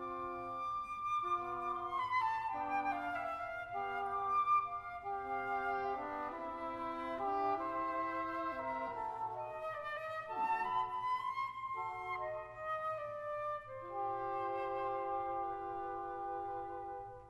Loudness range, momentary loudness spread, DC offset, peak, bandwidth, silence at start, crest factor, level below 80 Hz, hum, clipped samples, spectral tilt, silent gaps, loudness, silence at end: 3 LU; 7 LU; under 0.1%; -24 dBFS; 13 kHz; 0 s; 14 dB; -68 dBFS; none; under 0.1%; -5.5 dB/octave; none; -39 LUFS; 0 s